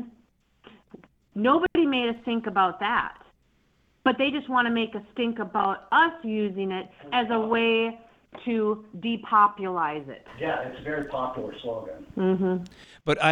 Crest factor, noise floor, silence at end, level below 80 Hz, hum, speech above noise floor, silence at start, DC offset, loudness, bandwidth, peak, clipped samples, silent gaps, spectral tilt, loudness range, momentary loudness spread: 20 dB; -66 dBFS; 0 s; -60 dBFS; none; 40 dB; 0 s; under 0.1%; -26 LUFS; 10.5 kHz; -6 dBFS; under 0.1%; none; -6.5 dB/octave; 2 LU; 13 LU